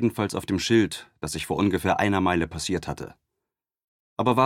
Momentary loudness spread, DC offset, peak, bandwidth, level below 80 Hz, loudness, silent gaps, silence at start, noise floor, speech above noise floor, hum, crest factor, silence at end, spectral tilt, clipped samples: 13 LU; under 0.1%; -6 dBFS; 16.5 kHz; -50 dBFS; -25 LUFS; 3.84-4.17 s; 0 s; -86 dBFS; 61 dB; none; 18 dB; 0 s; -5 dB/octave; under 0.1%